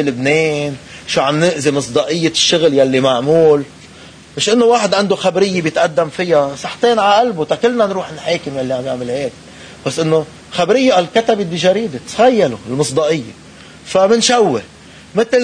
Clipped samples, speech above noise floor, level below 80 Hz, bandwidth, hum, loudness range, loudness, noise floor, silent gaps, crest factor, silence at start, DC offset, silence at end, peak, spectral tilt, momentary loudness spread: under 0.1%; 24 dB; -52 dBFS; 10.5 kHz; none; 3 LU; -14 LUFS; -38 dBFS; none; 14 dB; 0 s; under 0.1%; 0 s; 0 dBFS; -4 dB/octave; 10 LU